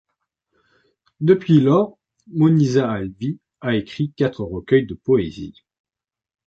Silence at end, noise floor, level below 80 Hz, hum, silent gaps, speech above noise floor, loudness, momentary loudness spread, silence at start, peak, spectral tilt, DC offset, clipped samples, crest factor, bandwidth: 0.95 s; -90 dBFS; -50 dBFS; none; none; 72 dB; -19 LUFS; 14 LU; 1.2 s; -2 dBFS; -8 dB/octave; under 0.1%; under 0.1%; 18 dB; 7.4 kHz